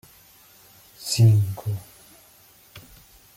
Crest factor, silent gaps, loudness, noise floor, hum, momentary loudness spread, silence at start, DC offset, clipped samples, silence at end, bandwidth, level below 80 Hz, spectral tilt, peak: 18 dB; none; -22 LUFS; -53 dBFS; none; 26 LU; 1 s; under 0.1%; under 0.1%; 0.6 s; 16 kHz; -60 dBFS; -5.5 dB/octave; -8 dBFS